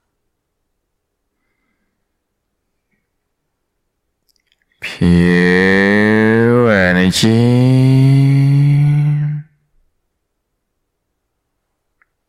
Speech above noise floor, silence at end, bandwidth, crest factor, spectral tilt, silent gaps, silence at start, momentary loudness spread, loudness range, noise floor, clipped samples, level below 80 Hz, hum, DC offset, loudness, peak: 61 dB; 2.85 s; 13.5 kHz; 14 dB; -7 dB/octave; none; 4.8 s; 7 LU; 10 LU; -71 dBFS; under 0.1%; -46 dBFS; none; under 0.1%; -11 LUFS; -2 dBFS